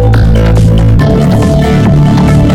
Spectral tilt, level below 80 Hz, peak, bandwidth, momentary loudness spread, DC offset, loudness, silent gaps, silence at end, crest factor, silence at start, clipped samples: -8 dB/octave; -12 dBFS; 0 dBFS; 12.5 kHz; 1 LU; under 0.1%; -7 LUFS; none; 0 s; 6 dB; 0 s; under 0.1%